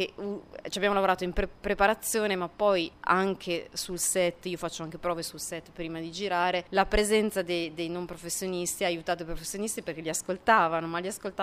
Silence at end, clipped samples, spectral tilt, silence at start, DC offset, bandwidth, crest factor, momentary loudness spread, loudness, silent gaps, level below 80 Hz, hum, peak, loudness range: 0 s; under 0.1%; -3 dB/octave; 0 s; under 0.1%; 15.5 kHz; 20 dB; 11 LU; -29 LUFS; none; -46 dBFS; none; -8 dBFS; 3 LU